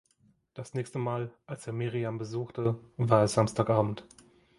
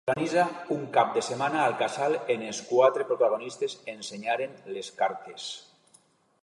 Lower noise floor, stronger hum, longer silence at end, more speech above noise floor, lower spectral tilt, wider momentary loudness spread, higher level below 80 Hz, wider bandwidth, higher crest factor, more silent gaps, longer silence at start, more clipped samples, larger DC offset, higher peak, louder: first, -68 dBFS vs -63 dBFS; neither; second, 0.55 s vs 0.8 s; about the same, 38 dB vs 35 dB; first, -6.5 dB/octave vs -4 dB/octave; about the same, 15 LU vs 14 LU; first, -60 dBFS vs -76 dBFS; about the same, 11.5 kHz vs 11.5 kHz; about the same, 24 dB vs 20 dB; neither; first, 0.55 s vs 0.05 s; neither; neither; about the same, -6 dBFS vs -8 dBFS; about the same, -30 LUFS vs -28 LUFS